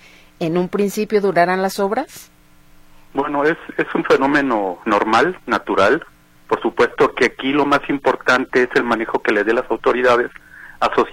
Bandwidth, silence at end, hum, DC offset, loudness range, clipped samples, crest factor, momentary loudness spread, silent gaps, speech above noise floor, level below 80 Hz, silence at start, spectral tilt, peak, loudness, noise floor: 16.5 kHz; 0 s; none; under 0.1%; 3 LU; under 0.1%; 18 dB; 6 LU; none; 30 dB; -48 dBFS; 0.4 s; -5 dB/octave; 0 dBFS; -17 LUFS; -47 dBFS